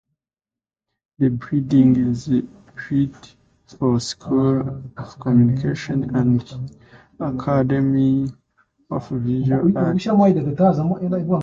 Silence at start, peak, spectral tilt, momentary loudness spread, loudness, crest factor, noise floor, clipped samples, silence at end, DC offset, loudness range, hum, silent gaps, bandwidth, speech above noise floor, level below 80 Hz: 1.2 s; -4 dBFS; -8 dB/octave; 13 LU; -20 LUFS; 16 dB; under -90 dBFS; under 0.1%; 0 s; under 0.1%; 3 LU; none; none; 8 kHz; over 71 dB; -50 dBFS